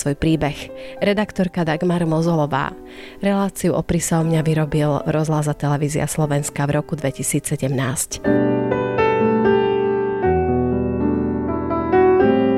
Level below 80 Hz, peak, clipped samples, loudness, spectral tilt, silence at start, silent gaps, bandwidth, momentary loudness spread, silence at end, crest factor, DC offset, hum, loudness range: -42 dBFS; -4 dBFS; under 0.1%; -19 LUFS; -6 dB/octave; 0 s; none; 14 kHz; 6 LU; 0 s; 14 dB; under 0.1%; none; 2 LU